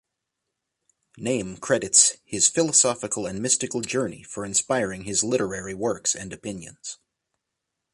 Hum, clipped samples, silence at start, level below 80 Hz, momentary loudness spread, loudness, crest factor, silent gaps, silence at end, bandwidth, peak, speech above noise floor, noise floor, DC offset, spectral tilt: none; under 0.1%; 1.15 s; -58 dBFS; 17 LU; -22 LUFS; 26 dB; none; 1 s; 11.5 kHz; 0 dBFS; 58 dB; -82 dBFS; under 0.1%; -2 dB/octave